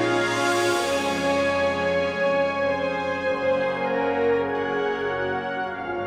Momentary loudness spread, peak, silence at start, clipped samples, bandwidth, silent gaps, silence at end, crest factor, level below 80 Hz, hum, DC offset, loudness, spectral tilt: 4 LU; -10 dBFS; 0 s; under 0.1%; 16 kHz; none; 0 s; 14 dB; -56 dBFS; none; under 0.1%; -24 LUFS; -4 dB/octave